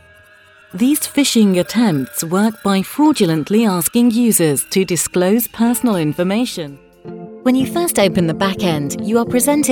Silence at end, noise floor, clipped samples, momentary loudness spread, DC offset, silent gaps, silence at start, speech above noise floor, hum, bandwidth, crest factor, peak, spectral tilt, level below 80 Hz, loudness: 0 s; -46 dBFS; under 0.1%; 7 LU; under 0.1%; none; 0.75 s; 31 dB; none; 19 kHz; 14 dB; -2 dBFS; -4.5 dB/octave; -52 dBFS; -15 LUFS